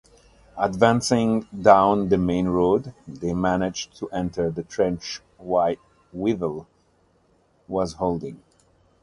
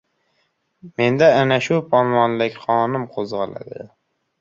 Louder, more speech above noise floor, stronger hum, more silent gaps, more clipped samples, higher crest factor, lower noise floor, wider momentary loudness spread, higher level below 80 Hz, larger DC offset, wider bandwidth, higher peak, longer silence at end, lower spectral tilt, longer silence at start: second, -23 LUFS vs -18 LUFS; second, 40 dB vs 49 dB; neither; neither; neither; about the same, 22 dB vs 18 dB; second, -62 dBFS vs -68 dBFS; second, 16 LU vs 19 LU; first, -48 dBFS vs -60 dBFS; neither; first, 11.5 kHz vs 7.6 kHz; about the same, 0 dBFS vs -2 dBFS; about the same, 0.65 s vs 0.55 s; about the same, -6 dB/octave vs -6.5 dB/octave; second, 0.55 s vs 0.85 s